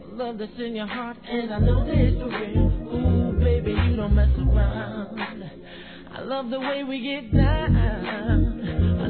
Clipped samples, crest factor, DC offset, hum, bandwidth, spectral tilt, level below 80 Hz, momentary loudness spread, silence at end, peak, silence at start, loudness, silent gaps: under 0.1%; 16 dB; 0.3%; none; 4.5 kHz; -11.5 dB/octave; -26 dBFS; 11 LU; 0 s; -8 dBFS; 0 s; -24 LUFS; none